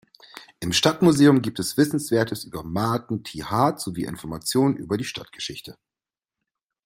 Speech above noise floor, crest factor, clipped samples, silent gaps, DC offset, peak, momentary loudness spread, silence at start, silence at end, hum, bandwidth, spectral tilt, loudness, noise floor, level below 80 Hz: over 68 dB; 22 dB; under 0.1%; none; under 0.1%; -2 dBFS; 15 LU; 0.35 s; 1.15 s; none; 16 kHz; -5 dB/octave; -23 LUFS; under -90 dBFS; -56 dBFS